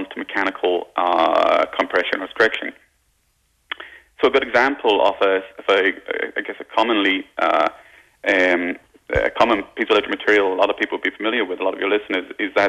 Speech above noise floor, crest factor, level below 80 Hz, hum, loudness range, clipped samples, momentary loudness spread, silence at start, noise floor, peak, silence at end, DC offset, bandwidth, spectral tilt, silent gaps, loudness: 45 dB; 14 dB; -50 dBFS; none; 2 LU; under 0.1%; 9 LU; 0 s; -64 dBFS; -6 dBFS; 0 s; under 0.1%; 11.5 kHz; -4.5 dB/octave; none; -19 LUFS